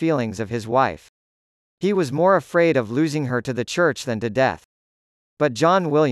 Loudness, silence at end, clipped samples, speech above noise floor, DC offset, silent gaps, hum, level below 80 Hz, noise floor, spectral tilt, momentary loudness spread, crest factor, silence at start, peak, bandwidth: -21 LUFS; 0 s; under 0.1%; over 70 dB; under 0.1%; 1.09-1.78 s, 4.65-5.37 s; none; -60 dBFS; under -90 dBFS; -6 dB/octave; 8 LU; 16 dB; 0 s; -4 dBFS; 12 kHz